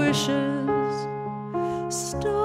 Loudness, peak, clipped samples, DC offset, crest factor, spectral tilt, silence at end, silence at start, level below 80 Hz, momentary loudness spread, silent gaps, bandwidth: -26 LUFS; -10 dBFS; under 0.1%; under 0.1%; 16 dB; -4.5 dB/octave; 0 s; 0 s; -50 dBFS; 7 LU; none; 16 kHz